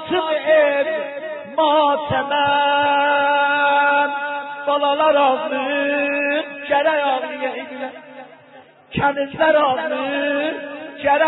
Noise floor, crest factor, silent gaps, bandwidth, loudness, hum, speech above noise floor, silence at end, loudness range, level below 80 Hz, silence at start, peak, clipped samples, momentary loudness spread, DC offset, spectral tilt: -46 dBFS; 14 dB; none; 4.1 kHz; -18 LUFS; none; 28 dB; 0 s; 5 LU; -56 dBFS; 0 s; -4 dBFS; under 0.1%; 11 LU; under 0.1%; -9 dB/octave